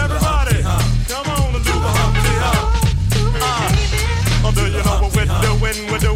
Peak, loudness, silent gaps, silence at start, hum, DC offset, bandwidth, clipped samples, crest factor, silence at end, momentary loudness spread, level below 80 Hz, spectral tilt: -2 dBFS; -17 LUFS; none; 0 s; none; under 0.1%; 16.5 kHz; under 0.1%; 12 dB; 0 s; 3 LU; -20 dBFS; -4.5 dB/octave